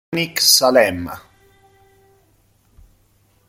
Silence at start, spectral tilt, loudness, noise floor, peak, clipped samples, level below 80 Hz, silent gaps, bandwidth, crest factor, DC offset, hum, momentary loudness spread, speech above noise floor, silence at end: 0.1 s; -2 dB/octave; -14 LUFS; -58 dBFS; 0 dBFS; under 0.1%; -56 dBFS; none; 16.5 kHz; 20 dB; under 0.1%; none; 20 LU; 42 dB; 2.3 s